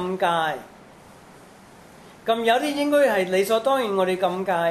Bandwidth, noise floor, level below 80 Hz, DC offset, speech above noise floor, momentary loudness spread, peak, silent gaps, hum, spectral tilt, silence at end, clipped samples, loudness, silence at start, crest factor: 14 kHz; -48 dBFS; -64 dBFS; under 0.1%; 26 dB; 7 LU; -6 dBFS; none; none; -4.5 dB/octave; 0 s; under 0.1%; -22 LUFS; 0 s; 16 dB